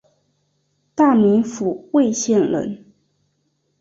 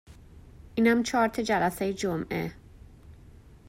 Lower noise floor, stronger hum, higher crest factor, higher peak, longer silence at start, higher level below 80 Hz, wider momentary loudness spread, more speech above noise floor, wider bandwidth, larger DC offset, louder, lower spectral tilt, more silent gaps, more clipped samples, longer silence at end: first, -68 dBFS vs -51 dBFS; neither; about the same, 16 dB vs 18 dB; first, -4 dBFS vs -12 dBFS; first, 0.95 s vs 0.1 s; second, -60 dBFS vs -52 dBFS; first, 15 LU vs 10 LU; first, 51 dB vs 25 dB; second, 7.8 kHz vs 16 kHz; neither; first, -18 LUFS vs -27 LUFS; about the same, -5.5 dB/octave vs -5 dB/octave; neither; neither; first, 1.05 s vs 0.15 s